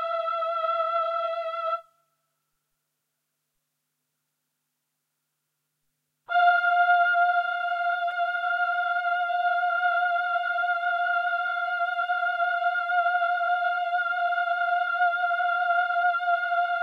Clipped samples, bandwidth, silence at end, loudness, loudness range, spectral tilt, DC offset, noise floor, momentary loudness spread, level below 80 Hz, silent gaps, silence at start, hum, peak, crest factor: under 0.1%; 5.2 kHz; 0 s; -25 LUFS; 8 LU; 1 dB/octave; under 0.1%; -80 dBFS; 6 LU; under -90 dBFS; none; 0 s; none; -10 dBFS; 16 dB